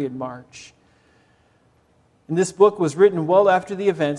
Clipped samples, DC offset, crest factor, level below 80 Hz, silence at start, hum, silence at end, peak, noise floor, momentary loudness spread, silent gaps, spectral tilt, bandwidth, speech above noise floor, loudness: under 0.1%; under 0.1%; 18 dB; -66 dBFS; 0 s; none; 0 s; -2 dBFS; -60 dBFS; 15 LU; none; -6 dB/octave; 11 kHz; 41 dB; -18 LUFS